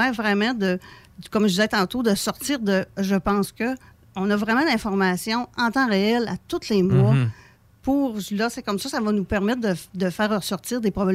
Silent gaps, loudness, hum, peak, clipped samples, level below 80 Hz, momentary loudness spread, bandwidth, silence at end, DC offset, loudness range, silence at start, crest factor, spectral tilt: none; -23 LUFS; none; -8 dBFS; under 0.1%; -50 dBFS; 8 LU; 16 kHz; 0 s; under 0.1%; 3 LU; 0 s; 14 dB; -5.5 dB/octave